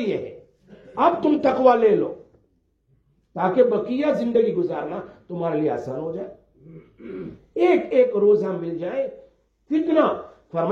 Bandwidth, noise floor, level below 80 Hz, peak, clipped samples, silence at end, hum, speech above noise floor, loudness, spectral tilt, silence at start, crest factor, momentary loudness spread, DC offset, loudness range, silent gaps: 7 kHz; -66 dBFS; -62 dBFS; -4 dBFS; under 0.1%; 0 s; none; 44 dB; -21 LUFS; -8 dB/octave; 0 s; 20 dB; 18 LU; under 0.1%; 5 LU; none